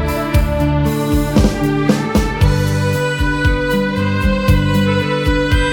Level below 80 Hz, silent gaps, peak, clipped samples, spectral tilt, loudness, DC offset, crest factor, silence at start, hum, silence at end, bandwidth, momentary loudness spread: -20 dBFS; none; 0 dBFS; under 0.1%; -6.5 dB/octave; -15 LUFS; under 0.1%; 14 dB; 0 s; none; 0 s; 19 kHz; 2 LU